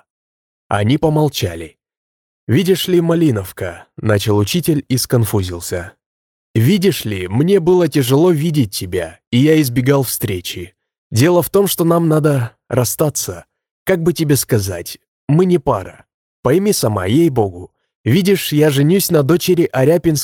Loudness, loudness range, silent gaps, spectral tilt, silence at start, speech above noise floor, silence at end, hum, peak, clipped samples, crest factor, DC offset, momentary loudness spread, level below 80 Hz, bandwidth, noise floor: -15 LUFS; 3 LU; 1.97-2.47 s, 6.06-6.54 s, 9.27-9.32 s, 10.98-11.10 s, 13.71-13.86 s, 15.08-15.27 s, 16.14-16.43 s, 17.95-18.04 s; -5.5 dB/octave; 0.7 s; over 76 dB; 0 s; none; 0 dBFS; under 0.1%; 14 dB; under 0.1%; 12 LU; -46 dBFS; 18 kHz; under -90 dBFS